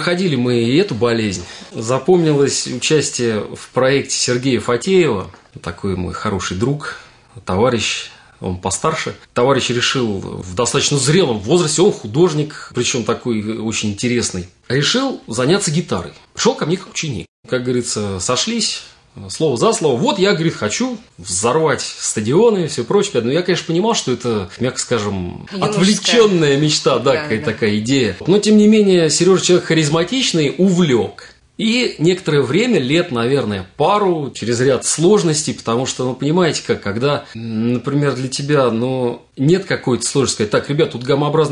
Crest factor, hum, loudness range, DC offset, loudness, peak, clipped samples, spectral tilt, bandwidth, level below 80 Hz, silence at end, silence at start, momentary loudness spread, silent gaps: 14 dB; none; 5 LU; under 0.1%; -16 LUFS; -2 dBFS; under 0.1%; -4.5 dB/octave; 11 kHz; -52 dBFS; 0 s; 0 s; 10 LU; 17.28-17.43 s